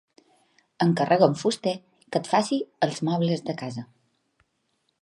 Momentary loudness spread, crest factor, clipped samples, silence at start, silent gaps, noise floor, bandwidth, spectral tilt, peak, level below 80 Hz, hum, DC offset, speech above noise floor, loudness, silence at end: 13 LU; 22 dB; under 0.1%; 0.8 s; none; -73 dBFS; 11.5 kHz; -6 dB/octave; -4 dBFS; -74 dBFS; none; under 0.1%; 49 dB; -25 LUFS; 1.2 s